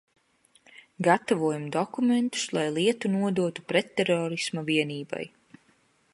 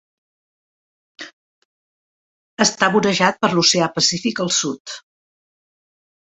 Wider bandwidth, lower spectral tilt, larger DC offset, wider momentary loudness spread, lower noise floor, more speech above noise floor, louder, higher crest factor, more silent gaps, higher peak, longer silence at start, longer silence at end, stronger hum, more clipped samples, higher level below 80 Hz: first, 11.5 kHz vs 8.4 kHz; first, -5 dB/octave vs -3 dB/octave; neither; second, 7 LU vs 22 LU; second, -65 dBFS vs under -90 dBFS; second, 39 dB vs over 72 dB; second, -27 LUFS vs -17 LUFS; about the same, 22 dB vs 20 dB; second, none vs 1.33-2.57 s, 4.80-4.85 s; second, -6 dBFS vs -2 dBFS; second, 1 s vs 1.2 s; second, 0.85 s vs 1.2 s; neither; neither; second, -74 dBFS vs -62 dBFS